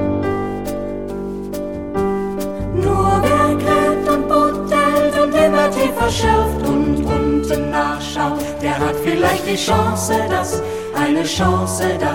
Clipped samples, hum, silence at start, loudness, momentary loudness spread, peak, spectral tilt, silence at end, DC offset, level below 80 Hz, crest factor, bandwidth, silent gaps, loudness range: under 0.1%; none; 0 s; -17 LUFS; 9 LU; -2 dBFS; -5 dB/octave; 0 s; 0.7%; -32 dBFS; 14 dB; 17 kHz; none; 3 LU